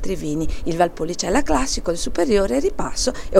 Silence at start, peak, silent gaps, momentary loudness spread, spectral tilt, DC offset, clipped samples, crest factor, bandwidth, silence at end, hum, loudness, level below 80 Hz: 0 s; 0 dBFS; none; 7 LU; -4 dB/octave; under 0.1%; under 0.1%; 18 dB; 15 kHz; 0 s; none; -21 LUFS; -30 dBFS